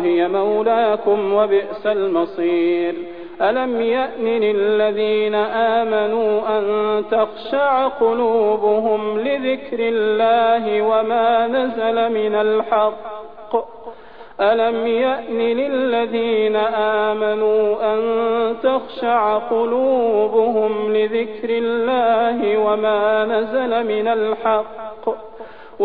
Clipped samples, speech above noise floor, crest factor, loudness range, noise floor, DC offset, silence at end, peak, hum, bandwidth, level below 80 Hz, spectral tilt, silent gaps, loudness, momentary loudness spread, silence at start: under 0.1%; 22 dB; 12 dB; 2 LU; -39 dBFS; 0.7%; 0 s; -6 dBFS; none; 4.7 kHz; -56 dBFS; -8.5 dB/octave; none; -18 LUFS; 5 LU; 0 s